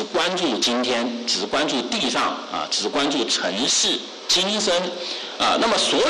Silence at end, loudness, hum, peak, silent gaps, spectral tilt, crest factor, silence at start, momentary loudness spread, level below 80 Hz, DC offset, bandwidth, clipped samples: 0 s; -21 LUFS; none; -10 dBFS; none; -1.5 dB/octave; 10 dB; 0 s; 6 LU; -58 dBFS; under 0.1%; 12.5 kHz; under 0.1%